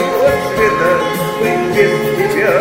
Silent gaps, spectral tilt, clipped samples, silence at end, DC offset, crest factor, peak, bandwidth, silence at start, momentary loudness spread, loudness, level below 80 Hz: none; -5 dB/octave; under 0.1%; 0 s; under 0.1%; 14 dB; 0 dBFS; 16.5 kHz; 0 s; 3 LU; -13 LUFS; -42 dBFS